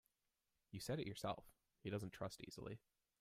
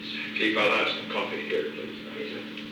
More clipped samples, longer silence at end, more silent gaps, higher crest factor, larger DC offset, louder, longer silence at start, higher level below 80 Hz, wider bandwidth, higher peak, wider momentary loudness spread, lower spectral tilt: neither; first, 0.45 s vs 0 s; neither; about the same, 20 dB vs 18 dB; neither; second, -50 LUFS vs -28 LUFS; first, 0.7 s vs 0 s; about the same, -74 dBFS vs -70 dBFS; second, 16 kHz vs over 20 kHz; second, -30 dBFS vs -12 dBFS; second, 9 LU vs 14 LU; first, -5.5 dB/octave vs -4 dB/octave